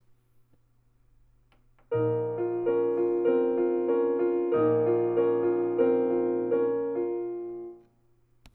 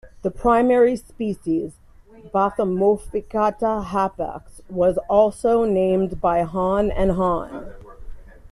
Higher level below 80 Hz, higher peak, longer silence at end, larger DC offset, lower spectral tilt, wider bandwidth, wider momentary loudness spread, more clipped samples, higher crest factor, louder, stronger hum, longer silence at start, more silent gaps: second, -70 dBFS vs -38 dBFS; second, -12 dBFS vs -4 dBFS; first, 0.75 s vs 0.05 s; neither; first, -11 dB/octave vs -7.5 dB/octave; second, 3.4 kHz vs 12.5 kHz; second, 8 LU vs 12 LU; neither; about the same, 14 dB vs 16 dB; second, -27 LUFS vs -21 LUFS; neither; first, 1.9 s vs 0.05 s; neither